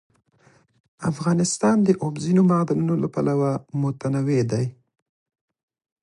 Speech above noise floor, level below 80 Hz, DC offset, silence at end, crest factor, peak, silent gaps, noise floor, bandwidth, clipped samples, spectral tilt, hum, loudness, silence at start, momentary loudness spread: 37 dB; -60 dBFS; under 0.1%; 1.3 s; 18 dB; -6 dBFS; none; -58 dBFS; 11.5 kHz; under 0.1%; -7 dB/octave; none; -22 LUFS; 1 s; 8 LU